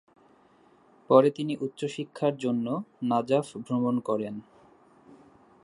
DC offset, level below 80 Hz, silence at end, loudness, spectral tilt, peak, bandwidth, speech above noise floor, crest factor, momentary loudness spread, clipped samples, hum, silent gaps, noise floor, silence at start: under 0.1%; -74 dBFS; 1.2 s; -27 LUFS; -7 dB/octave; -6 dBFS; 11.5 kHz; 33 dB; 24 dB; 12 LU; under 0.1%; none; none; -60 dBFS; 1.1 s